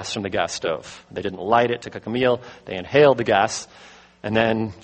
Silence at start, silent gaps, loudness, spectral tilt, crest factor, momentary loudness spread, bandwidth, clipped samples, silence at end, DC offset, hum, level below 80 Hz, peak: 0 s; none; -21 LUFS; -4.5 dB/octave; 20 dB; 16 LU; 8.8 kHz; under 0.1%; 0.05 s; under 0.1%; none; -54 dBFS; -2 dBFS